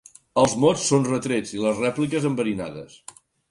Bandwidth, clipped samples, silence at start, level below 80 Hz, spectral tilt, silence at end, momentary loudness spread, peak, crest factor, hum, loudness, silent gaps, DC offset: 11.5 kHz; under 0.1%; 0.35 s; -56 dBFS; -5 dB/octave; 0.65 s; 16 LU; -4 dBFS; 18 dB; none; -22 LUFS; none; under 0.1%